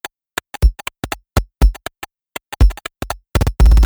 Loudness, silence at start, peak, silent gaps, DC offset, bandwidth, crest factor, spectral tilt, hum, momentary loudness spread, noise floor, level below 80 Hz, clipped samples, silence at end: -19 LUFS; 0.05 s; 0 dBFS; none; under 0.1%; over 20 kHz; 16 dB; -5.5 dB/octave; none; 15 LU; -34 dBFS; -16 dBFS; under 0.1%; 0 s